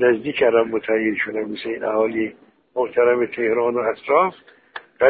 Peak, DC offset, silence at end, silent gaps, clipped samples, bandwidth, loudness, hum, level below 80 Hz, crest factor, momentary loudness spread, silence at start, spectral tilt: -2 dBFS; under 0.1%; 0 s; none; under 0.1%; 4.8 kHz; -20 LUFS; none; -60 dBFS; 18 dB; 10 LU; 0 s; -10 dB/octave